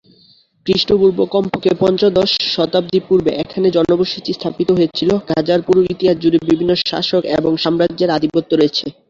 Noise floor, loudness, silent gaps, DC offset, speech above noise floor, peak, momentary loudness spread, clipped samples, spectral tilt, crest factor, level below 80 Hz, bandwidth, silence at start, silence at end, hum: -51 dBFS; -15 LUFS; none; under 0.1%; 36 dB; -2 dBFS; 4 LU; under 0.1%; -6.5 dB/octave; 14 dB; -48 dBFS; 7.4 kHz; 0.65 s; 0.2 s; none